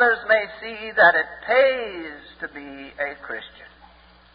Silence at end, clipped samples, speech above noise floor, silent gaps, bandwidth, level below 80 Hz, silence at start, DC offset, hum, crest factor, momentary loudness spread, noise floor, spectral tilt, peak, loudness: 0.7 s; under 0.1%; 29 dB; none; 5.2 kHz; -58 dBFS; 0 s; under 0.1%; none; 20 dB; 20 LU; -51 dBFS; -7.5 dB/octave; -2 dBFS; -20 LUFS